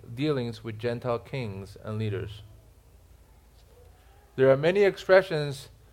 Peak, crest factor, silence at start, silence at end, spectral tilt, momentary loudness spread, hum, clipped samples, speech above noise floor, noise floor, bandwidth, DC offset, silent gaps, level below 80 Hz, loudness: -6 dBFS; 22 dB; 0.1 s; 0.25 s; -6.5 dB/octave; 19 LU; none; under 0.1%; 29 dB; -55 dBFS; 15.5 kHz; under 0.1%; none; -56 dBFS; -26 LUFS